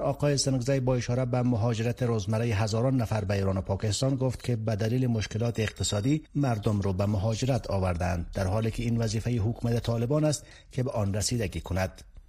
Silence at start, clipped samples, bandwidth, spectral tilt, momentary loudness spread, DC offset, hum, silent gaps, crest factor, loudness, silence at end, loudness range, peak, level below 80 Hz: 0 s; under 0.1%; 14.5 kHz; -6 dB/octave; 4 LU; under 0.1%; none; none; 16 dB; -28 LUFS; 0.1 s; 2 LU; -12 dBFS; -46 dBFS